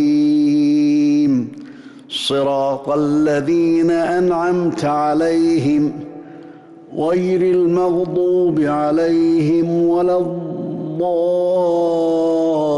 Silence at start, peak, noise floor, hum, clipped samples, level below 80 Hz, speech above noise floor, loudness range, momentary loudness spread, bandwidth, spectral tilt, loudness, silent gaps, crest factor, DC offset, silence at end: 0 s; -8 dBFS; -39 dBFS; none; under 0.1%; -56 dBFS; 23 dB; 2 LU; 9 LU; 11.5 kHz; -7 dB/octave; -16 LUFS; none; 8 dB; under 0.1%; 0 s